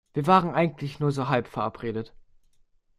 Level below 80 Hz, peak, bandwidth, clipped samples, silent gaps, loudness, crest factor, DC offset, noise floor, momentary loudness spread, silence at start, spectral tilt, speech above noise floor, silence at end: -56 dBFS; -6 dBFS; 12.5 kHz; under 0.1%; none; -26 LUFS; 20 dB; under 0.1%; -62 dBFS; 12 LU; 0.15 s; -7.5 dB/octave; 37 dB; 0.9 s